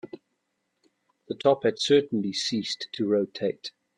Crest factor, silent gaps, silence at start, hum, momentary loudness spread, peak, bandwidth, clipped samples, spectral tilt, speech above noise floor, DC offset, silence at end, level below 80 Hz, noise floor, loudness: 20 dB; none; 0.05 s; none; 12 LU; -8 dBFS; 10.5 kHz; under 0.1%; -4.5 dB/octave; 52 dB; under 0.1%; 0.3 s; -72 dBFS; -78 dBFS; -26 LUFS